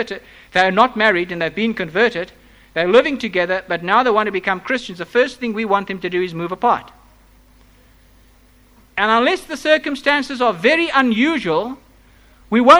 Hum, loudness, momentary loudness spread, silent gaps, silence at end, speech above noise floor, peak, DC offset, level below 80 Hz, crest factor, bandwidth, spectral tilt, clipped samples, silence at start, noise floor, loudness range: none; -17 LUFS; 9 LU; none; 0 s; 33 dB; 0 dBFS; under 0.1%; -52 dBFS; 18 dB; over 20 kHz; -5 dB/octave; under 0.1%; 0 s; -50 dBFS; 5 LU